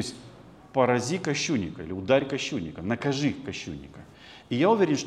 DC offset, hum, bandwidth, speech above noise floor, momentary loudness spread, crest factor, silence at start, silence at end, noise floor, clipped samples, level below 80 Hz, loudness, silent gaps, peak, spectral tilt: under 0.1%; none; 12 kHz; 22 dB; 21 LU; 20 dB; 0 s; 0 s; -49 dBFS; under 0.1%; -58 dBFS; -27 LUFS; none; -8 dBFS; -5 dB/octave